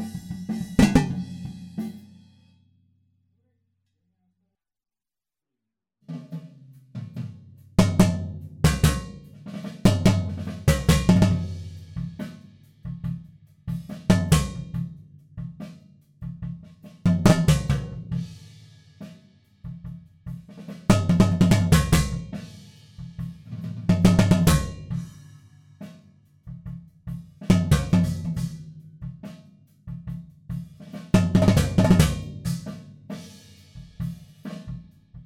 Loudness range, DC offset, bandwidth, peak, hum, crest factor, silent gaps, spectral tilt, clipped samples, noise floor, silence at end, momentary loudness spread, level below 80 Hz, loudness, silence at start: 10 LU; under 0.1%; 17 kHz; -4 dBFS; none; 22 dB; none; -6.5 dB/octave; under 0.1%; under -90 dBFS; 0.05 s; 23 LU; -36 dBFS; -23 LUFS; 0 s